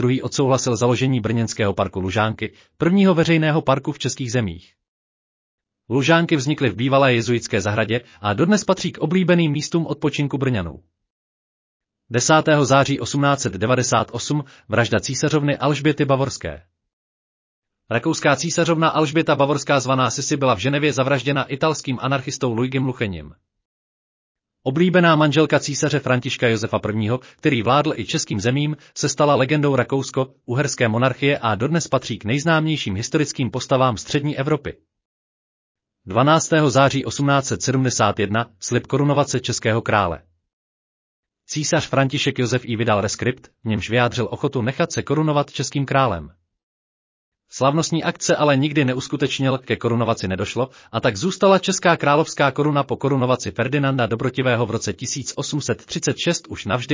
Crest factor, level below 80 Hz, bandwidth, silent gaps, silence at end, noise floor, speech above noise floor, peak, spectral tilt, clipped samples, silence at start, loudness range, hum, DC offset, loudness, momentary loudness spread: 18 dB; -48 dBFS; 7.8 kHz; 4.88-5.58 s, 11.10-11.80 s, 16.93-17.62 s, 23.65-24.35 s, 35.05-35.75 s, 40.53-41.23 s, 46.63-47.32 s; 0 s; under -90 dBFS; over 71 dB; -2 dBFS; -5 dB/octave; under 0.1%; 0 s; 4 LU; none; under 0.1%; -20 LUFS; 8 LU